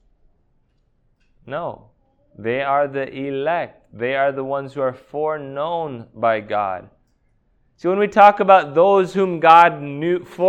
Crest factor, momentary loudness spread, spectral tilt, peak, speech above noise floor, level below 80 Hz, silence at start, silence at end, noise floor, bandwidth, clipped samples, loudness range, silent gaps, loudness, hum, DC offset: 20 dB; 17 LU; -6.5 dB/octave; 0 dBFS; 44 dB; -60 dBFS; 1.45 s; 0 s; -62 dBFS; 9 kHz; under 0.1%; 10 LU; none; -18 LUFS; none; under 0.1%